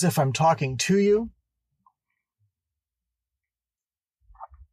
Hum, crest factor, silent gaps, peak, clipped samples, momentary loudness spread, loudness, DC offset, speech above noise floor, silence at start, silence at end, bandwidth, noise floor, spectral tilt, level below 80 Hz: none; 16 dB; none; -10 dBFS; under 0.1%; 5 LU; -22 LUFS; under 0.1%; over 68 dB; 0 s; 0.3 s; 15.5 kHz; under -90 dBFS; -5.5 dB/octave; -58 dBFS